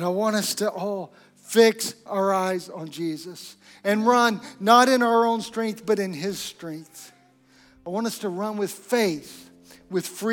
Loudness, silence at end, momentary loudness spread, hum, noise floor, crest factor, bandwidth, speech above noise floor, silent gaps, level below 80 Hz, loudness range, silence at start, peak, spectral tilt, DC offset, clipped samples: -23 LUFS; 0 s; 19 LU; none; -57 dBFS; 22 dB; 18 kHz; 33 dB; none; -70 dBFS; 8 LU; 0 s; -4 dBFS; -4 dB/octave; under 0.1%; under 0.1%